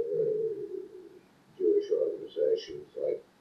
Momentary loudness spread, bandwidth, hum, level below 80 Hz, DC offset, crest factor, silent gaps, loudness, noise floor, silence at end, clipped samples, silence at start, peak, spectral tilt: 14 LU; 6.2 kHz; none; -76 dBFS; under 0.1%; 16 dB; none; -31 LUFS; -57 dBFS; 0.2 s; under 0.1%; 0 s; -16 dBFS; -6.5 dB/octave